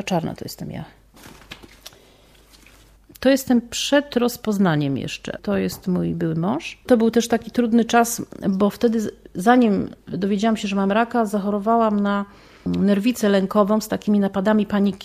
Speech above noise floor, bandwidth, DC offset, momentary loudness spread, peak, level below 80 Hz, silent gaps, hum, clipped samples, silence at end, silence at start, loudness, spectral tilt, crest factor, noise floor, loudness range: 32 dB; 15.5 kHz; under 0.1%; 12 LU; -2 dBFS; -52 dBFS; none; none; under 0.1%; 0 s; 0 s; -20 LUFS; -5.5 dB/octave; 18 dB; -51 dBFS; 4 LU